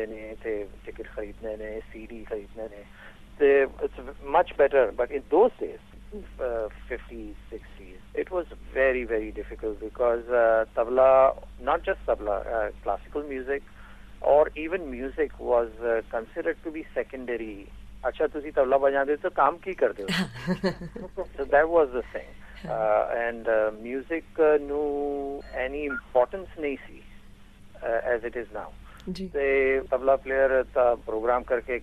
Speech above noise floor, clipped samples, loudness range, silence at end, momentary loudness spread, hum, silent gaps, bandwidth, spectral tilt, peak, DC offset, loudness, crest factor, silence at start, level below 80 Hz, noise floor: 22 dB; under 0.1%; 7 LU; 0 s; 17 LU; none; none; 13 kHz; -6.5 dB/octave; -8 dBFS; under 0.1%; -26 LUFS; 20 dB; 0 s; -46 dBFS; -48 dBFS